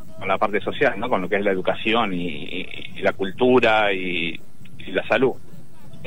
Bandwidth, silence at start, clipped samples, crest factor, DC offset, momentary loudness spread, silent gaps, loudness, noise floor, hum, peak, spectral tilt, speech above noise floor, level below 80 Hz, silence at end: 16 kHz; 0.05 s; under 0.1%; 16 dB; 4%; 13 LU; none; -22 LUFS; -45 dBFS; none; -6 dBFS; -6 dB/octave; 23 dB; -54 dBFS; 0 s